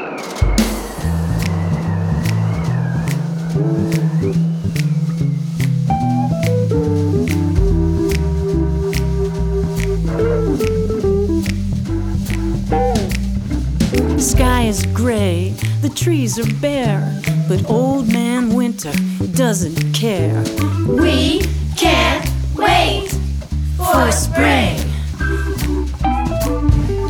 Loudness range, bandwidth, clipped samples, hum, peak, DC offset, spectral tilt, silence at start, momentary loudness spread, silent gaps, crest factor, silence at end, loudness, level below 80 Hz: 3 LU; 19 kHz; under 0.1%; none; 0 dBFS; under 0.1%; -5.5 dB/octave; 0 s; 6 LU; none; 16 dB; 0 s; -17 LUFS; -24 dBFS